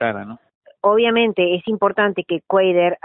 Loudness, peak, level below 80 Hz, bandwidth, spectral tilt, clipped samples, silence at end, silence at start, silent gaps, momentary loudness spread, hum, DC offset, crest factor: -18 LUFS; -2 dBFS; -62 dBFS; 4 kHz; -10.5 dB/octave; under 0.1%; 0.1 s; 0 s; 0.55-0.61 s; 9 LU; none; under 0.1%; 16 dB